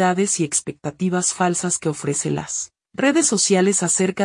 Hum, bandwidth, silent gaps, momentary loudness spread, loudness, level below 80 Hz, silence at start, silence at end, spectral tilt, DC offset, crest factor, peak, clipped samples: none; 12 kHz; none; 9 LU; -19 LUFS; -62 dBFS; 0 s; 0 s; -3.5 dB/octave; under 0.1%; 14 dB; -6 dBFS; under 0.1%